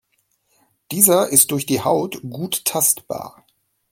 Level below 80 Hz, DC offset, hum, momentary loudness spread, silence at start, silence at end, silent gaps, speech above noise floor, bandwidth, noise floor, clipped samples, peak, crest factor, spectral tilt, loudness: -62 dBFS; under 0.1%; none; 16 LU; 0.9 s; 0.65 s; none; 48 dB; 17 kHz; -67 dBFS; under 0.1%; 0 dBFS; 20 dB; -3 dB/octave; -16 LUFS